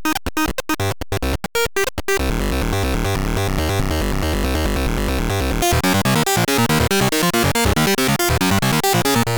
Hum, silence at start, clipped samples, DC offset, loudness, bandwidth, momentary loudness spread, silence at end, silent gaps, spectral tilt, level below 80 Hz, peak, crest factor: none; 0 s; under 0.1%; 1%; -18 LUFS; over 20 kHz; 5 LU; 0 s; none; -4 dB/octave; -26 dBFS; -6 dBFS; 12 dB